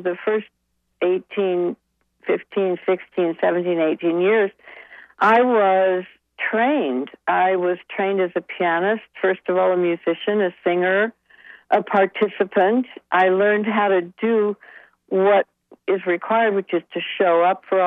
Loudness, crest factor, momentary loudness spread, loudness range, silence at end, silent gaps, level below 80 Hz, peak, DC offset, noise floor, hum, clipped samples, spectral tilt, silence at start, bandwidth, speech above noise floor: -20 LUFS; 16 dB; 8 LU; 2 LU; 0 s; none; -76 dBFS; -4 dBFS; under 0.1%; -47 dBFS; none; under 0.1%; -8 dB/octave; 0 s; 4.6 kHz; 28 dB